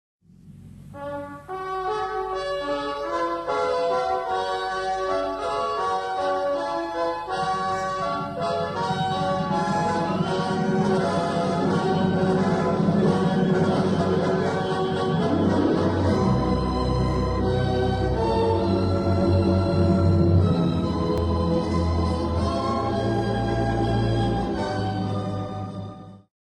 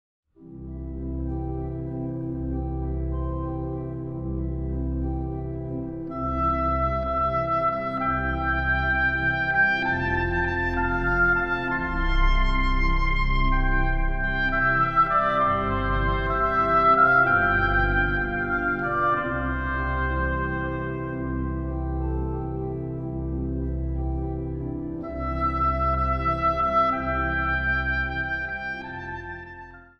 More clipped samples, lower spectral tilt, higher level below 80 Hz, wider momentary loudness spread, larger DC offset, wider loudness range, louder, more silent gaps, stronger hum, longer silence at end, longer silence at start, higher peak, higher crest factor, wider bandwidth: neither; about the same, -7.5 dB/octave vs -8 dB/octave; second, -38 dBFS vs -30 dBFS; second, 7 LU vs 11 LU; neither; second, 4 LU vs 9 LU; about the same, -24 LUFS vs -25 LUFS; neither; neither; about the same, 0.25 s vs 0.15 s; about the same, 0.45 s vs 0.4 s; about the same, -8 dBFS vs -8 dBFS; about the same, 16 dB vs 18 dB; first, 10.5 kHz vs 6.4 kHz